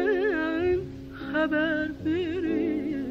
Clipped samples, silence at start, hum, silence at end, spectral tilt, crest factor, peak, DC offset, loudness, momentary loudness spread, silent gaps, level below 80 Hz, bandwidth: under 0.1%; 0 s; none; 0 s; -7.5 dB/octave; 14 dB; -14 dBFS; under 0.1%; -27 LUFS; 6 LU; none; -50 dBFS; 7 kHz